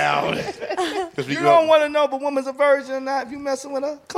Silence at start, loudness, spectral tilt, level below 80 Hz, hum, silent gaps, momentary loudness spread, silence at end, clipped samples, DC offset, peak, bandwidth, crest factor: 0 s; -21 LUFS; -4.5 dB/octave; -60 dBFS; none; none; 11 LU; 0 s; under 0.1%; under 0.1%; -4 dBFS; 13.5 kHz; 16 dB